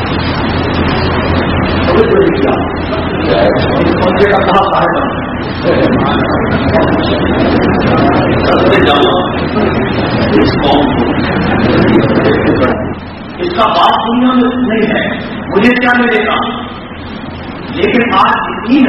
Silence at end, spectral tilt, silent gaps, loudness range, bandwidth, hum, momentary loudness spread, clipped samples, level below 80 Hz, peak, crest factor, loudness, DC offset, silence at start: 0 s; -8 dB/octave; none; 2 LU; 6.2 kHz; none; 8 LU; 0.2%; -28 dBFS; 0 dBFS; 10 dB; -10 LUFS; under 0.1%; 0 s